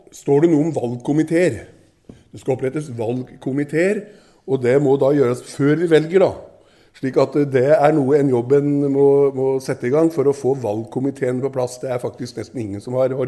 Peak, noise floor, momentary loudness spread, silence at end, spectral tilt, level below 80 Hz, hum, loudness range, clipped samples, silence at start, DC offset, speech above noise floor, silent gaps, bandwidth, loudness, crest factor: 0 dBFS; -46 dBFS; 11 LU; 0 s; -7.5 dB/octave; -58 dBFS; none; 6 LU; under 0.1%; 0.15 s; under 0.1%; 28 dB; none; 12 kHz; -18 LUFS; 18 dB